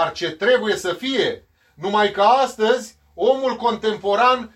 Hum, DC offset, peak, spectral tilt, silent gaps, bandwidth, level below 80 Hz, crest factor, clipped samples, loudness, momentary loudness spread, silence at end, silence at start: none; under 0.1%; -4 dBFS; -3.5 dB/octave; none; 14.5 kHz; -58 dBFS; 16 dB; under 0.1%; -19 LUFS; 7 LU; 0.1 s; 0 s